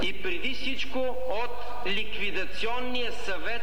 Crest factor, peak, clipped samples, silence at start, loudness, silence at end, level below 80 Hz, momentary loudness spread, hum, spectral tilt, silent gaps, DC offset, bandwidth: 14 dB; -16 dBFS; under 0.1%; 0 s; -31 LUFS; 0 s; -48 dBFS; 3 LU; none; -4 dB/octave; none; 7%; 19.5 kHz